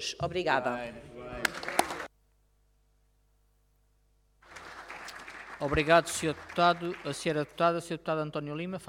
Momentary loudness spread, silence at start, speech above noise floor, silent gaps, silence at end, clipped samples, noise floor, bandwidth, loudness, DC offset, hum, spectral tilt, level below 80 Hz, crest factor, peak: 19 LU; 0 s; 39 dB; none; 0 s; under 0.1%; -69 dBFS; 17.5 kHz; -30 LUFS; under 0.1%; 50 Hz at -65 dBFS; -4 dB/octave; -54 dBFS; 24 dB; -8 dBFS